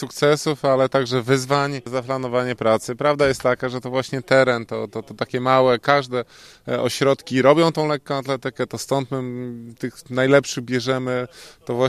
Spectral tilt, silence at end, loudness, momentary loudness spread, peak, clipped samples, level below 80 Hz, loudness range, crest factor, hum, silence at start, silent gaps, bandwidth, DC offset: -5 dB/octave; 0 s; -20 LUFS; 12 LU; 0 dBFS; under 0.1%; -56 dBFS; 3 LU; 20 dB; none; 0 s; none; 13.5 kHz; under 0.1%